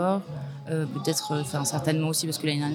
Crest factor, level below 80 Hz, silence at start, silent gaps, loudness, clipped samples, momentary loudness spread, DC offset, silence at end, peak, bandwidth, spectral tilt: 16 dB; -66 dBFS; 0 s; none; -28 LUFS; under 0.1%; 6 LU; under 0.1%; 0 s; -12 dBFS; 17.5 kHz; -4.5 dB/octave